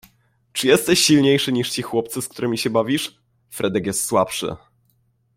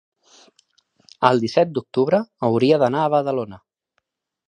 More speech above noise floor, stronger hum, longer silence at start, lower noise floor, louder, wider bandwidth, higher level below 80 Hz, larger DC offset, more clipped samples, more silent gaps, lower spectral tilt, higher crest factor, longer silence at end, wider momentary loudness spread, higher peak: second, 44 dB vs 55 dB; neither; second, 0.55 s vs 1.2 s; second, -64 dBFS vs -73 dBFS; about the same, -19 LUFS vs -19 LUFS; first, 16.5 kHz vs 10 kHz; first, -56 dBFS vs -64 dBFS; neither; neither; neither; second, -3.5 dB/octave vs -7 dB/octave; about the same, 20 dB vs 20 dB; second, 0.8 s vs 0.95 s; first, 15 LU vs 7 LU; about the same, -2 dBFS vs 0 dBFS